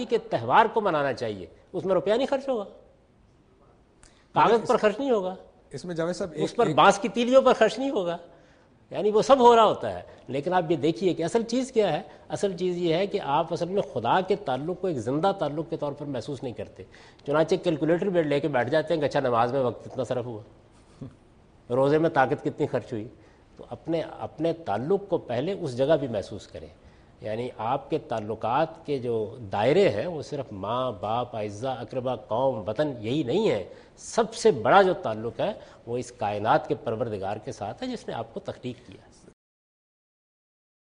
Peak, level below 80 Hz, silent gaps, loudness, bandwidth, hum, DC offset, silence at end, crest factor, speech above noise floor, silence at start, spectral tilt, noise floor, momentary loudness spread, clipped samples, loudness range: -4 dBFS; -60 dBFS; none; -26 LUFS; 10 kHz; none; under 0.1%; 1.95 s; 22 dB; 34 dB; 0 s; -6 dB/octave; -59 dBFS; 16 LU; under 0.1%; 7 LU